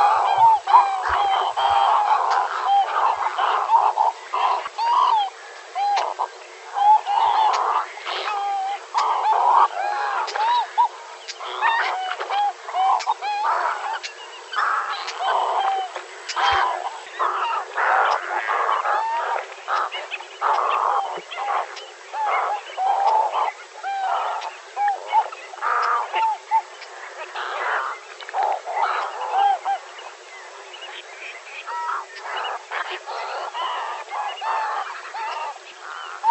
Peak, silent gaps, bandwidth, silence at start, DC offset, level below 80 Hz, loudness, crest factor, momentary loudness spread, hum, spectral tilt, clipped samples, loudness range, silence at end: -2 dBFS; none; 8.6 kHz; 0 s; under 0.1%; -62 dBFS; -22 LUFS; 20 dB; 15 LU; none; -0.5 dB/octave; under 0.1%; 8 LU; 0 s